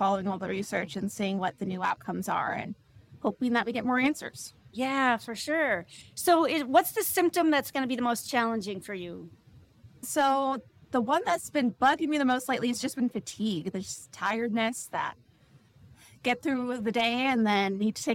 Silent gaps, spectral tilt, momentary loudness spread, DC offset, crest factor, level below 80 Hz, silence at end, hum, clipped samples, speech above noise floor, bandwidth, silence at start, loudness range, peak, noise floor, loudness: none; -4 dB/octave; 11 LU; under 0.1%; 22 dB; -68 dBFS; 0 s; none; under 0.1%; 31 dB; 17 kHz; 0 s; 5 LU; -8 dBFS; -60 dBFS; -29 LUFS